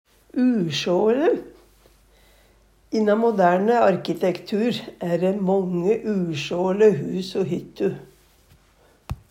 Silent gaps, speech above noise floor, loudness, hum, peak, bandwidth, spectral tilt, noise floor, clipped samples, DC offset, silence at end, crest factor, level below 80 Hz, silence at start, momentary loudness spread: none; 36 dB; -22 LUFS; none; -6 dBFS; 16 kHz; -6.5 dB/octave; -57 dBFS; under 0.1%; under 0.1%; 0.15 s; 18 dB; -54 dBFS; 0.35 s; 9 LU